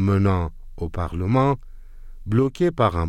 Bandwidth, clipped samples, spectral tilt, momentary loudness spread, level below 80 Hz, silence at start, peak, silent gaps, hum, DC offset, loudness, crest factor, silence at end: 9.8 kHz; under 0.1%; -8.5 dB/octave; 12 LU; -38 dBFS; 0 s; -6 dBFS; none; none; under 0.1%; -22 LUFS; 16 dB; 0 s